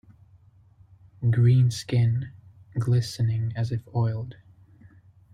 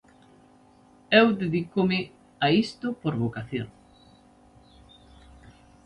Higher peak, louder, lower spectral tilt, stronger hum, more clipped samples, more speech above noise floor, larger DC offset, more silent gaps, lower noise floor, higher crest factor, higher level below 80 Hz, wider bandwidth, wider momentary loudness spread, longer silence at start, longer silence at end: second, -10 dBFS vs -4 dBFS; about the same, -25 LUFS vs -25 LUFS; about the same, -7 dB/octave vs -7 dB/octave; neither; neither; about the same, 33 dB vs 32 dB; neither; neither; about the same, -56 dBFS vs -56 dBFS; second, 16 dB vs 24 dB; about the same, -56 dBFS vs -58 dBFS; about the same, 10 kHz vs 10.5 kHz; about the same, 14 LU vs 15 LU; about the same, 1.2 s vs 1.1 s; second, 1 s vs 2.15 s